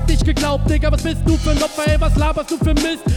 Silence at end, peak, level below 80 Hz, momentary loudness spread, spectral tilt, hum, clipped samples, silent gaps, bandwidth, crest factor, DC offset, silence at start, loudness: 0 s; -4 dBFS; -18 dBFS; 2 LU; -5.5 dB/octave; none; under 0.1%; none; 15 kHz; 12 dB; under 0.1%; 0 s; -18 LUFS